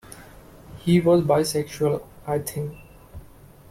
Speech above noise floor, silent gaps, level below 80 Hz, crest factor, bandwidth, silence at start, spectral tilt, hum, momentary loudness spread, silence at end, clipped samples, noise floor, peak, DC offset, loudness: 26 dB; none; -50 dBFS; 18 dB; 16 kHz; 0.1 s; -6.5 dB/octave; none; 16 LU; 0.5 s; under 0.1%; -48 dBFS; -6 dBFS; under 0.1%; -23 LUFS